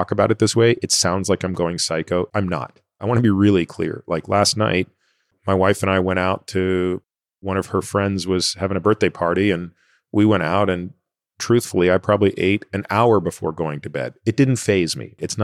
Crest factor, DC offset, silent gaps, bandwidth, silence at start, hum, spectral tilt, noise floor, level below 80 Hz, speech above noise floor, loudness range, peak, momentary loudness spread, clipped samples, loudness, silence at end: 16 dB; under 0.1%; none; 15 kHz; 0 s; none; -5 dB/octave; -64 dBFS; -54 dBFS; 45 dB; 2 LU; -4 dBFS; 10 LU; under 0.1%; -19 LUFS; 0 s